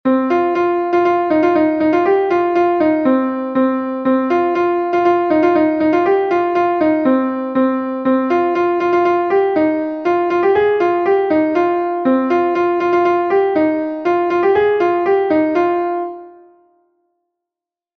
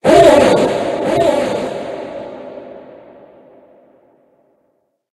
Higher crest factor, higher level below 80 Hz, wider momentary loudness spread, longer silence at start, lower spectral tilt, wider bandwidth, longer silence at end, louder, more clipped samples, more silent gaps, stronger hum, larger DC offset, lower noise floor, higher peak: about the same, 12 dB vs 16 dB; second, -56 dBFS vs -44 dBFS; second, 4 LU vs 25 LU; about the same, 0.05 s vs 0.05 s; first, -7 dB/octave vs -5 dB/octave; second, 6.2 kHz vs 12.5 kHz; second, 1.65 s vs 2.2 s; about the same, -15 LUFS vs -13 LUFS; second, under 0.1% vs 0.2%; neither; neither; neither; first, -87 dBFS vs -64 dBFS; about the same, -2 dBFS vs 0 dBFS